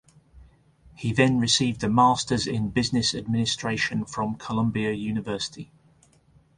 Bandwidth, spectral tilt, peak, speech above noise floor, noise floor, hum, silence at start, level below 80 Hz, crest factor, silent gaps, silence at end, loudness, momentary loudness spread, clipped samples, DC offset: 11 kHz; -4.5 dB/octave; -4 dBFS; 35 dB; -59 dBFS; none; 0.35 s; -52 dBFS; 22 dB; none; 0.95 s; -24 LUFS; 10 LU; under 0.1%; under 0.1%